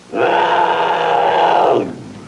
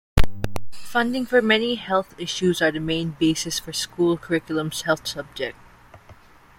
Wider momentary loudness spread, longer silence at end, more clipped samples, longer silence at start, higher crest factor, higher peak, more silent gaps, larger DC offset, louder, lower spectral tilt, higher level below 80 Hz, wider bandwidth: second, 4 LU vs 11 LU; second, 0 s vs 0.45 s; neither; about the same, 0.1 s vs 0.15 s; second, 12 dB vs 20 dB; about the same, -2 dBFS vs -2 dBFS; neither; neither; first, -14 LUFS vs -23 LUFS; about the same, -5 dB/octave vs -4.5 dB/octave; second, -60 dBFS vs -36 dBFS; second, 11 kHz vs 16.5 kHz